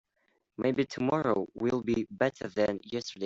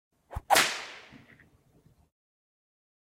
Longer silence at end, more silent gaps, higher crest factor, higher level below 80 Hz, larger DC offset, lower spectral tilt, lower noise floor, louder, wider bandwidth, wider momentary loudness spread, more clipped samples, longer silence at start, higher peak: second, 0 s vs 1.95 s; neither; second, 20 dB vs 26 dB; second, -64 dBFS vs -54 dBFS; neither; first, -6 dB/octave vs -1 dB/octave; first, -75 dBFS vs -63 dBFS; second, -31 LUFS vs -26 LUFS; second, 7.8 kHz vs 16 kHz; second, 5 LU vs 22 LU; neither; first, 0.6 s vs 0.3 s; second, -12 dBFS vs -8 dBFS